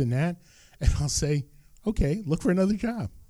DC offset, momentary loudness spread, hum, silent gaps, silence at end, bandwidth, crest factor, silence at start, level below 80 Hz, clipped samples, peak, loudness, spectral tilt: under 0.1%; 9 LU; none; none; 0.1 s; 15 kHz; 18 dB; 0 s; -34 dBFS; under 0.1%; -8 dBFS; -27 LUFS; -6 dB/octave